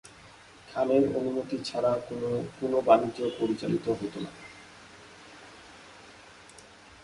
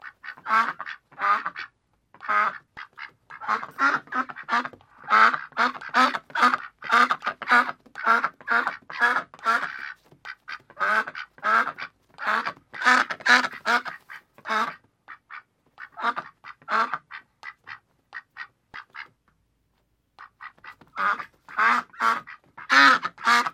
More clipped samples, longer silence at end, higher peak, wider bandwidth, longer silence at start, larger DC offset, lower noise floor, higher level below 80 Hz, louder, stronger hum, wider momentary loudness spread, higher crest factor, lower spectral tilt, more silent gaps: neither; first, 0.4 s vs 0.05 s; second, -6 dBFS vs -2 dBFS; second, 11.5 kHz vs 16 kHz; about the same, 0.05 s vs 0.05 s; neither; second, -52 dBFS vs -71 dBFS; first, -64 dBFS vs -74 dBFS; second, -28 LUFS vs -23 LUFS; neither; first, 26 LU vs 23 LU; about the same, 24 dB vs 24 dB; first, -6.5 dB/octave vs -1.5 dB/octave; neither